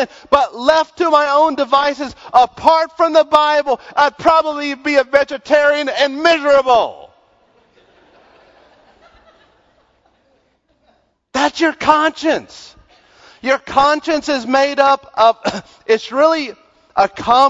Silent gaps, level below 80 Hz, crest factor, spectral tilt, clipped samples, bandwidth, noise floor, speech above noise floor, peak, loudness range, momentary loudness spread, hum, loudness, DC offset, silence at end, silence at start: none; -52 dBFS; 16 dB; -3 dB/octave; under 0.1%; 8.2 kHz; -60 dBFS; 46 dB; 0 dBFS; 6 LU; 8 LU; none; -14 LUFS; under 0.1%; 0 s; 0 s